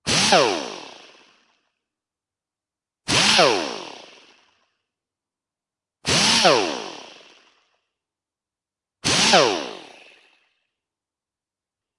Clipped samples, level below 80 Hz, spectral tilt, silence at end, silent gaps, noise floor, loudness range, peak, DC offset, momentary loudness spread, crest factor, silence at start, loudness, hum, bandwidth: under 0.1%; -58 dBFS; -2 dB/octave; 2.15 s; none; under -90 dBFS; 1 LU; 0 dBFS; under 0.1%; 21 LU; 24 dB; 0.05 s; -17 LUFS; none; 11.5 kHz